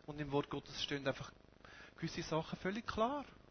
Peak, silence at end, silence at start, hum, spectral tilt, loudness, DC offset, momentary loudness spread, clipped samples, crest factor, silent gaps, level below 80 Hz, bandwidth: -22 dBFS; 0.1 s; 0.05 s; none; -5 dB/octave; -41 LUFS; under 0.1%; 15 LU; under 0.1%; 20 dB; none; -64 dBFS; 6.6 kHz